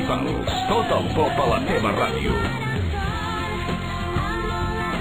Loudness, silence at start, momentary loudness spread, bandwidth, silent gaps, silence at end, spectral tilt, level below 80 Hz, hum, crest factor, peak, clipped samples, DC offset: -23 LUFS; 0 s; 5 LU; 19.5 kHz; none; 0 s; -6 dB/octave; -34 dBFS; none; 16 dB; -8 dBFS; under 0.1%; 0.6%